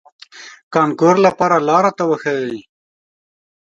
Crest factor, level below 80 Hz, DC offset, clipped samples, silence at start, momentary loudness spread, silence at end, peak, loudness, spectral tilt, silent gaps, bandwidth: 18 dB; -62 dBFS; under 0.1%; under 0.1%; 0.35 s; 13 LU; 1.2 s; 0 dBFS; -15 LUFS; -6 dB/octave; 0.63-0.71 s; 7.8 kHz